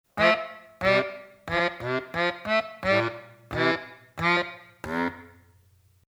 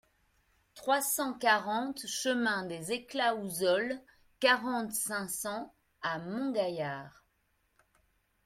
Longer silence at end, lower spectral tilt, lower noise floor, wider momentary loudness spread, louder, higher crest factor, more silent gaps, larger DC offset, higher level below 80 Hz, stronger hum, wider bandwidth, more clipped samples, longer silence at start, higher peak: second, 0.8 s vs 1.35 s; first, -5.5 dB/octave vs -2.5 dB/octave; second, -60 dBFS vs -75 dBFS; first, 17 LU vs 11 LU; first, -26 LUFS vs -32 LUFS; about the same, 22 dB vs 20 dB; neither; neither; first, -56 dBFS vs -72 dBFS; neither; first, over 20 kHz vs 16.5 kHz; neither; second, 0.15 s vs 0.75 s; first, -6 dBFS vs -12 dBFS